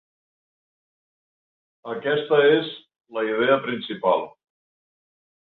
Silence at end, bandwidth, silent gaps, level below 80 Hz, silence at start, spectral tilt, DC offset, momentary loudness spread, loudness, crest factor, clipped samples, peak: 1.2 s; 4.4 kHz; none; -74 dBFS; 1.85 s; -8 dB/octave; under 0.1%; 18 LU; -22 LUFS; 20 dB; under 0.1%; -6 dBFS